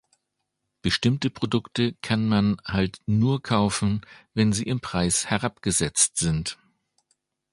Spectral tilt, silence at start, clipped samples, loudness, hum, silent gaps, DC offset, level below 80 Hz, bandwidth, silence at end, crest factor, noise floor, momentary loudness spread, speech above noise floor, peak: -4.5 dB/octave; 0.85 s; under 0.1%; -24 LUFS; none; none; under 0.1%; -46 dBFS; 11.5 kHz; 1 s; 20 dB; -80 dBFS; 7 LU; 56 dB; -6 dBFS